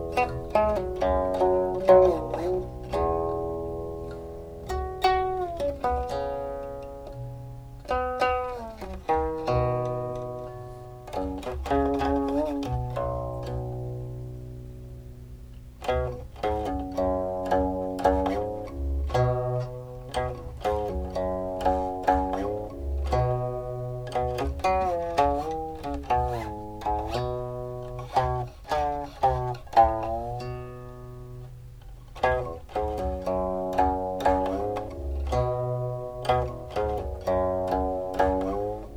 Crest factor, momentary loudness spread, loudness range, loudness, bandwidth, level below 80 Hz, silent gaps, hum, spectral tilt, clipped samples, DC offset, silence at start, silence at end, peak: 22 dB; 14 LU; 6 LU; -28 LUFS; 18.5 kHz; -38 dBFS; none; none; -7 dB/octave; under 0.1%; under 0.1%; 0 s; 0 s; -6 dBFS